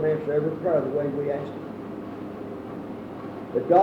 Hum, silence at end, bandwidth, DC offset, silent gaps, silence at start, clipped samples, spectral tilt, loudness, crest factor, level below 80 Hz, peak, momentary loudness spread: none; 0 s; 6.2 kHz; under 0.1%; none; 0 s; under 0.1%; -9 dB/octave; -28 LUFS; 18 dB; -62 dBFS; -8 dBFS; 12 LU